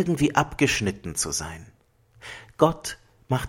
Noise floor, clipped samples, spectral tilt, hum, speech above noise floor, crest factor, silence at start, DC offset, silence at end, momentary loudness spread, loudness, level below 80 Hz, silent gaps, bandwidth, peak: -58 dBFS; under 0.1%; -4.5 dB/octave; none; 33 dB; 24 dB; 0 s; under 0.1%; 0 s; 20 LU; -24 LUFS; -48 dBFS; none; 16.5 kHz; -2 dBFS